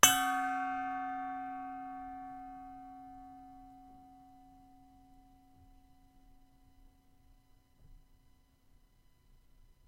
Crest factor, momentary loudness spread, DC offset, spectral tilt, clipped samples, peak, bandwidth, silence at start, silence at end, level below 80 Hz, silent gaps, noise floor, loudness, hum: 36 dB; 25 LU; under 0.1%; 0 dB/octave; under 0.1%; -4 dBFS; 16 kHz; 0.05 s; 0.15 s; -64 dBFS; none; -66 dBFS; -36 LUFS; none